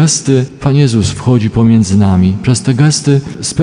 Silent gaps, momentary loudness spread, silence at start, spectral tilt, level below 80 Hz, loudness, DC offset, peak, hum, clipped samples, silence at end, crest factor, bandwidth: none; 4 LU; 0 s; -5.5 dB/octave; -36 dBFS; -11 LUFS; under 0.1%; 0 dBFS; none; under 0.1%; 0 s; 10 dB; 10.5 kHz